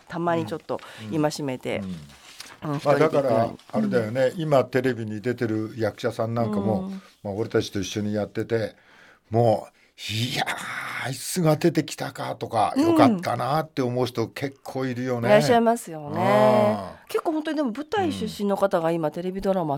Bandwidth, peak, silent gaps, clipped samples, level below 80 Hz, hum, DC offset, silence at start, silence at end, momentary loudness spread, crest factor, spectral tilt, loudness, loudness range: 17.5 kHz; -2 dBFS; none; under 0.1%; -60 dBFS; none; under 0.1%; 0.1 s; 0 s; 12 LU; 22 dB; -6 dB/octave; -24 LUFS; 5 LU